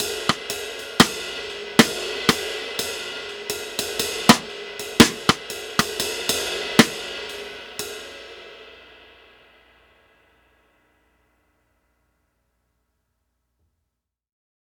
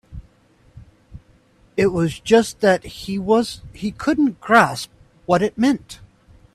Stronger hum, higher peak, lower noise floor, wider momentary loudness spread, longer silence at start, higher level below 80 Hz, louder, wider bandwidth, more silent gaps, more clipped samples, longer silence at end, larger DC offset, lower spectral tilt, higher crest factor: neither; about the same, 0 dBFS vs 0 dBFS; first, -82 dBFS vs -55 dBFS; about the same, 17 LU vs 15 LU; about the same, 0 s vs 0.1 s; about the same, -52 dBFS vs -48 dBFS; about the same, -21 LUFS vs -19 LUFS; first, over 20 kHz vs 13.5 kHz; neither; neither; first, 5.8 s vs 0.5 s; neither; second, -3 dB/octave vs -5.5 dB/octave; first, 26 dB vs 20 dB